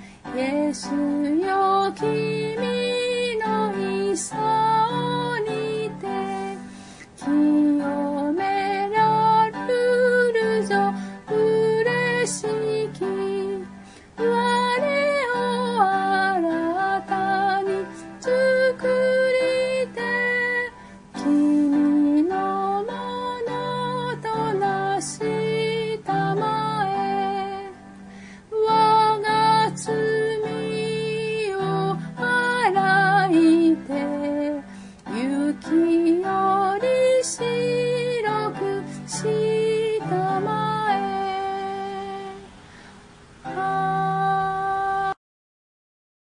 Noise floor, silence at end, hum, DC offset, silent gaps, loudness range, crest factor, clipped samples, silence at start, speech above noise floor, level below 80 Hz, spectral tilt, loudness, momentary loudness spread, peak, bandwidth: -47 dBFS; 1.25 s; none; under 0.1%; none; 5 LU; 16 dB; under 0.1%; 0 s; 25 dB; -58 dBFS; -5 dB/octave; -22 LUFS; 10 LU; -6 dBFS; 11 kHz